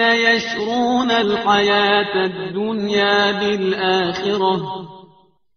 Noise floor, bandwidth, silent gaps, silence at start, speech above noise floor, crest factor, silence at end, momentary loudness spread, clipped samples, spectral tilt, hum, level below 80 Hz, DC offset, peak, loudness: -54 dBFS; 6.6 kHz; none; 0 s; 36 dB; 16 dB; 0.55 s; 8 LU; under 0.1%; -2 dB/octave; none; -56 dBFS; under 0.1%; -2 dBFS; -17 LUFS